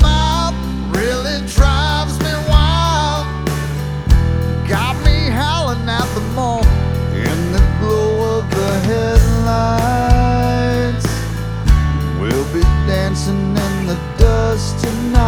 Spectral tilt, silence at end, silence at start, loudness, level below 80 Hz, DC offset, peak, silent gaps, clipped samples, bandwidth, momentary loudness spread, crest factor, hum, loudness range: -6 dB/octave; 0 s; 0 s; -16 LUFS; -18 dBFS; under 0.1%; 0 dBFS; none; 0.2%; 16 kHz; 6 LU; 14 dB; none; 2 LU